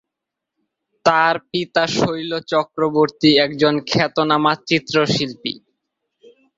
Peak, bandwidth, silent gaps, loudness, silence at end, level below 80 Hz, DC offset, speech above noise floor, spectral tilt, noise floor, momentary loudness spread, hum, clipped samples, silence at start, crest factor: -2 dBFS; 7.8 kHz; none; -18 LUFS; 1 s; -56 dBFS; under 0.1%; 65 dB; -5 dB/octave; -83 dBFS; 8 LU; none; under 0.1%; 1.05 s; 18 dB